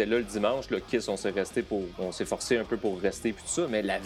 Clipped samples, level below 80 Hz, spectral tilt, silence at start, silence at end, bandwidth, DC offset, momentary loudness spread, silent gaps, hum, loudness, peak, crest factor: under 0.1%; -54 dBFS; -4 dB/octave; 0 s; 0 s; 14.5 kHz; under 0.1%; 5 LU; none; none; -30 LUFS; -12 dBFS; 18 dB